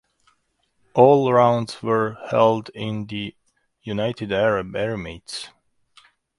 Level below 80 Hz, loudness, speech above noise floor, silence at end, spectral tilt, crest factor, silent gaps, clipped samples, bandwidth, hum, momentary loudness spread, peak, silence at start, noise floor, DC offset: -54 dBFS; -21 LUFS; 48 dB; 0.9 s; -6.5 dB/octave; 22 dB; none; under 0.1%; 11.5 kHz; none; 17 LU; 0 dBFS; 0.95 s; -68 dBFS; under 0.1%